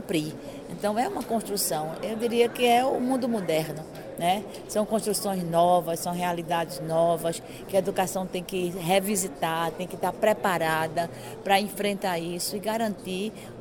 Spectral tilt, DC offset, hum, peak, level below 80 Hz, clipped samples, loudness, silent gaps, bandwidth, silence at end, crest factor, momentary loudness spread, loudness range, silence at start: -4 dB/octave; under 0.1%; none; -8 dBFS; -58 dBFS; under 0.1%; -27 LUFS; none; 17.5 kHz; 0 s; 18 dB; 9 LU; 1 LU; 0 s